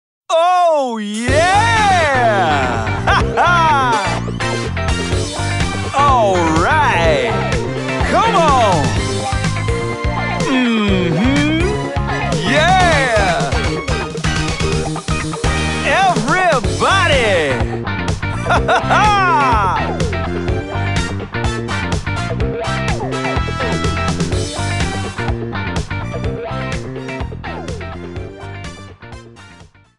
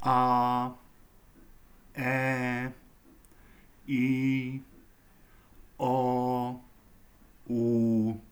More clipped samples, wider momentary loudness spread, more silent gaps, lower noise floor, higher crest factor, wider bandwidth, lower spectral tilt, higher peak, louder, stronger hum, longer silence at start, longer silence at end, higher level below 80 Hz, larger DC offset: neither; about the same, 11 LU vs 13 LU; neither; second, -42 dBFS vs -58 dBFS; about the same, 16 dB vs 18 dB; second, 11.5 kHz vs over 20 kHz; second, -5 dB/octave vs -7.5 dB/octave; first, 0 dBFS vs -12 dBFS; first, -15 LUFS vs -29 LUFS; neither; first, 0.3 s vs 0 s; about the same, 0.2 s vs 0.1 s; first, -28 dBFS vs -58 dBFS; first, 0.9% vs under 0.1%